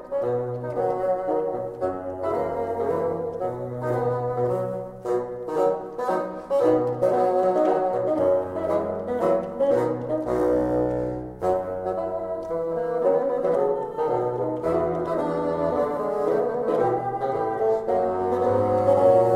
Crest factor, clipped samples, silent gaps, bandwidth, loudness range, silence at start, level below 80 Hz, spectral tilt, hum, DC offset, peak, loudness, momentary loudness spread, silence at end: 18 dB; under 0.1%; none; 12 kHz; 4 LU; 0 s; -52 dBFS; -8.5 dB/octave; none; under 0.1%; -6 dBFS; -24 LUFS; 7 LU; 0 s